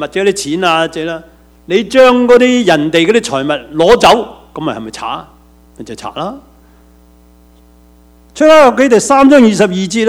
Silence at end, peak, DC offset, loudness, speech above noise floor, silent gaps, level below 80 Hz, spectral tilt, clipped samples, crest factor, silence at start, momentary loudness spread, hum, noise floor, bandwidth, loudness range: 0 s; 0 dBFS; under 0.1%; -9 LUFS; 34 dB; none; -42 dBFS; -4.5 dB/octave; 1%; 10 dB; 0 s; 17 LU; none; -43 dBFS; 16 kHz; 17 LU